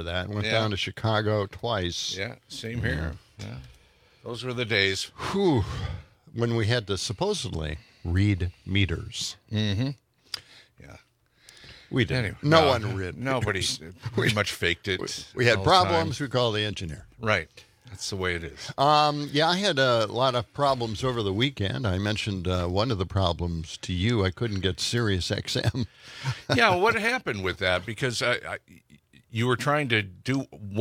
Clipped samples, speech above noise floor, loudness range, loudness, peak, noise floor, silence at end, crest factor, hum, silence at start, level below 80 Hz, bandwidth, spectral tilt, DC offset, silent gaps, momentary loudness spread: under 0.1%; 35 dB; 5 LU; -26 LUFS; -2 dBFS; -61 dBFS; 0 s; 24 dB; none; 0 s; -50 dBFS; 15.5 kHz; -5 dB/octave; under 0.1%; none; 13 LU